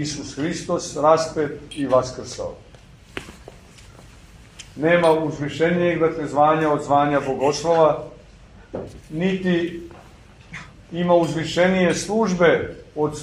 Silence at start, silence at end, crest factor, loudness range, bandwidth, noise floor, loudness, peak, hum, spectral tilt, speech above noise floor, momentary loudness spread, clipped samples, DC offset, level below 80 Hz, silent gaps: 0 s; 0 s; 18 dB; 8 LU; 12 kHz; -46 dBFS; -20 LUFS; -2 dBFS; none; -5.5 dB/octave; 26 dB; 19 LU; under 0.1%; under 0.1%; -50 dBFS; none